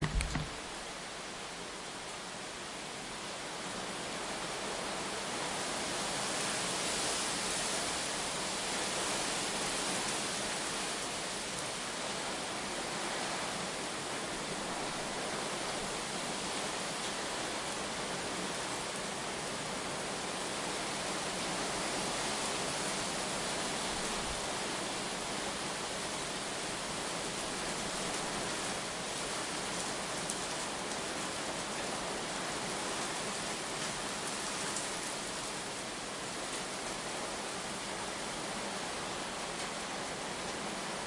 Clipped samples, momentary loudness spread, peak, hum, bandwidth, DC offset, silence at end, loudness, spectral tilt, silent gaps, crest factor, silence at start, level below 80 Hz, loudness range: under 0.1%; 5 LU; -12 dBFS; none; 11.5 kHz; under 0.1%; 0 s; -36 LUFS; -2 dB/octave; none; 24 dB; 0 s; -56 dBFS; 4 LU